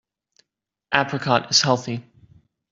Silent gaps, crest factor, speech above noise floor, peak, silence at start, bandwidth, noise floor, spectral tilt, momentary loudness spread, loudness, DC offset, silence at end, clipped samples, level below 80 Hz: none; 24 dB; 60 dB; -2 dBFS; 0.9 s; 7.8 kHz; -81 dBFS; -3 dB/octave; 12 LU; -20 LUFS; under 0.1%; 0.7 s; under 0.1%; -60 dBFS